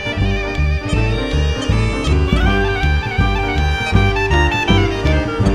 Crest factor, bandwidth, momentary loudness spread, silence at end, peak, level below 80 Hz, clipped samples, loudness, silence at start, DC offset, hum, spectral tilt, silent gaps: 14 dB; 10.5 kHz; 4 LU; 0 s; 0 dBFS; -20 dBFS; under 0.1%; -16 LUFS; 0 s; under 0.1%; none; -6 dB/octave; none